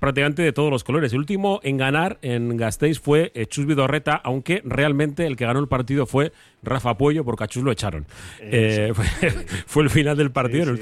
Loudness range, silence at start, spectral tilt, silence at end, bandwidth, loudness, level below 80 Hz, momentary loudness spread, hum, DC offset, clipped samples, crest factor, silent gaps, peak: 2 LU; 0 s; -6 dB/octave; 0 s; 13.5 kHz; -21 LUFS; -40 dBFS; 6 LU; none; under 0.1%; under 0.1%; 16 dB; none; -6 dBFS